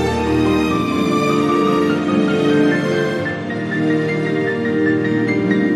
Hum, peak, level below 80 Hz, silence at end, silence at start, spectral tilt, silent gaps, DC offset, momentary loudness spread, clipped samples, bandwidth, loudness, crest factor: none; -4 dBFS; -44 dBFS; 0 s; 0 s; -6.5 dB/octave; none; under 0.1%; 4 LU; under 0.1%; 13 kHz; -17 LUFS; 12 dB